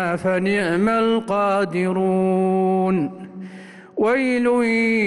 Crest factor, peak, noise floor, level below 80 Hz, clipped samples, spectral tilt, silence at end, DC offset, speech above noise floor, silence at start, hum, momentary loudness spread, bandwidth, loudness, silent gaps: 10 dB; -10 dBFS; -40 dBFS; -58 dBFS; under 0.1%; -7 dB/octave; 0 s; under 0.1%; 21 dB; 0 s; none; 16 LU; 11.5 kHz; -19 LUFS; none